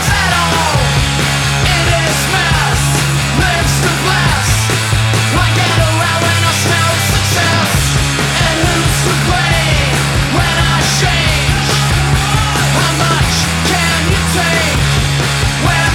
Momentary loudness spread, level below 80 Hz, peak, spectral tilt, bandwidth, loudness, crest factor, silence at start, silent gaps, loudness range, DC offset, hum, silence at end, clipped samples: 1 LU; -22 dBFS; 0 dBFS; -3.5 dB/octave; 17.5 kHz; -11 LUFS; 12 dB; 0 s; none; 0 LU; under 0.1%; none; 0 s; under 0.1%